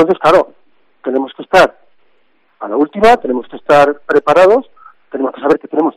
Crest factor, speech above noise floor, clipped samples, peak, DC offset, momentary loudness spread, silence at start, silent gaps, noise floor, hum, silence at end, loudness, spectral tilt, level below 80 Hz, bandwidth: 12 dB; 46 dB; under 0.1%; 0 dBFS; under 0.1%; 12 LU; 0 s; none; -58 dBFS; none; 0.05 s; -12 LUFS; -5.5 dB/octave; -46 dBFS; 13.5 kHz